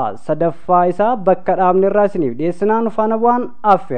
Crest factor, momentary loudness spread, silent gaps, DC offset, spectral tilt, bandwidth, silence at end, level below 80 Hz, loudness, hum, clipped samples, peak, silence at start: 14 dB; 5 LU; none; 5%; -9 dB/octave; 9.2 kHz; 0 s; -52 dBFS; -16 LUFS; none; under 0.1%; 0 dBFS; 0 s